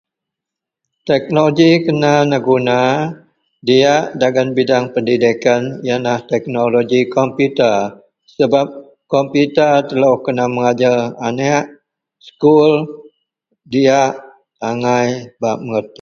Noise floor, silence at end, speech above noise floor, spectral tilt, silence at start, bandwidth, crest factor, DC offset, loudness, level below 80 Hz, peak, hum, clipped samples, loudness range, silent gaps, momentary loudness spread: -83 dBFS; 0.15 s; 69 dB; -6 dB/octave; 1.05 s; 7.2 kHz; 14 dB; under 0.1%; -14 LUFS; -58 dBFS; 0 dBFS; none; under 0.1%; 2 LU; none; 9 LU